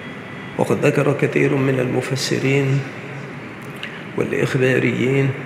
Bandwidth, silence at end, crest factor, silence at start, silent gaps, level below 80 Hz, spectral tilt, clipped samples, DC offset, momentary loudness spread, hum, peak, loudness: 14 kHz; 0 s; 18 dB; 0 s; none; -60 dBFS; -6 dB/octave; under 0.1%; under 0.1%; 14 LU; none; -2 dBFS; -19 LUFS